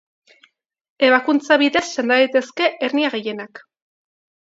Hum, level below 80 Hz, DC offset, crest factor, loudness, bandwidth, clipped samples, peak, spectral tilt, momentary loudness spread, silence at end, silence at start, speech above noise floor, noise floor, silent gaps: none; -66 dBFS; under 0.1%; 20 dB; -18 LUFS; 7.8 kHz; under 0.1%; 0 dBFS; -3 dB/octave; 12 LU; 0.9 s; 1 s; 41 dB; -58 dBFS; none